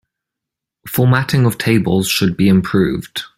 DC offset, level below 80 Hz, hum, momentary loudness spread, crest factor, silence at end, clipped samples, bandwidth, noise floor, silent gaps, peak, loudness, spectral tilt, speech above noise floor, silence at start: under 0.1%; -44 dBFS; none; 5 LU; 14 dB; 0.1 s; under 0.1%; 16.5 kHz; -83 dBFS; none; 0 dBFS; -15 LUFS; -6 dB/octave; 69 dB; 0.85 s